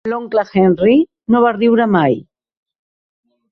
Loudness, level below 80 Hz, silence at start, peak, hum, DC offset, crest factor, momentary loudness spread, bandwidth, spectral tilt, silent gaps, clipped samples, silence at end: -14 LUFS; -54 dBFS; 0.05 s; -2 dBFS; none; under 0.1%; 14 dB; 6 LU; 6 kHz; -9 dB/octave; none; under 0.1%; 1.3 s